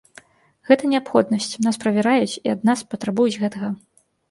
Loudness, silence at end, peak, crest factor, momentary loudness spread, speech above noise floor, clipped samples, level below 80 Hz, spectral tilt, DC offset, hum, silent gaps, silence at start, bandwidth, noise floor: -20 LUFS; 0.55 s; 0 dBFS; 20 dB; 8 LU; 30 dB; under 0.1%; -66 dBFS; -5 dB/octave; under 0.1%; none; none; 0.7 s; 11.5 kHz; -50 dBFS